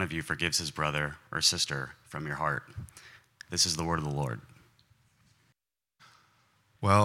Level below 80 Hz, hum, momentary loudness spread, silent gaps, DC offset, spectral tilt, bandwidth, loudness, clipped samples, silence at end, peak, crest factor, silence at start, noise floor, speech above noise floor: -58 dBFS; none; 19 LU; none; under 0.1%; -3 dB/octave; 16.5 kHz; -30 LUFS; under 0.1%; 0 s; -8 dBFS; 24 dB; 0 s; -78 dBFS; 46 dB